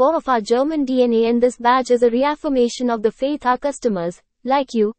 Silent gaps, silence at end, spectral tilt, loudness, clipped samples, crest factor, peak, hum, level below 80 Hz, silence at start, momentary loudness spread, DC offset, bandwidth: none; 0.05 s; -5 dB/octave; -18 LUFS; under 0.1%; 14 dB; -4 dBFS; none; -52 dBFS; 0 s; 6 LU; under 0.1%; 8.8 kHz